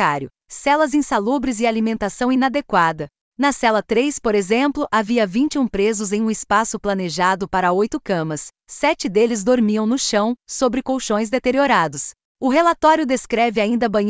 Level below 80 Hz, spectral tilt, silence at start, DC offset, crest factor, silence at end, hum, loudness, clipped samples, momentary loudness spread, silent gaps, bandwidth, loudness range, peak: -50 dBFS; -4.5 dB/octave; 0 s; under 0.1%; 16 dB; 0 s; none; -19 LUFS; under 0.1%; 6 LU; 3.21-3.32 s, 12.25-12.35 s; 8 kHz; 1 LU; -4 dBFS